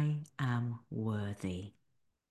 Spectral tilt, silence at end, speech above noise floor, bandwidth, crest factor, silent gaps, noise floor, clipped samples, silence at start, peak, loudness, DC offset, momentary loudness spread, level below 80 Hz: -7.5 dB/octave; 0.6 s; 41 dB; 12 kHz; 16 dB; none; -79 dBFS; under 0.1%; 0 s; -22 dBFS; -38 LUFS; under 0.1%; 8 LU; -60 dBFS